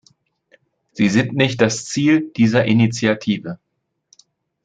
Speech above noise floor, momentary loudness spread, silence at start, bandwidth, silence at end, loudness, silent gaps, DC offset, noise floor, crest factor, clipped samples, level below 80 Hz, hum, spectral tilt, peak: 57 dB; 10 LU; 0.95 s; 9.4 kHz; 1.1 s; -17 LUFS; none; under 0.1%; -74 dBFS; 18 dB; under 0.1%; -56 dBFS; none; -5.5 dB/octave; -2 dBFS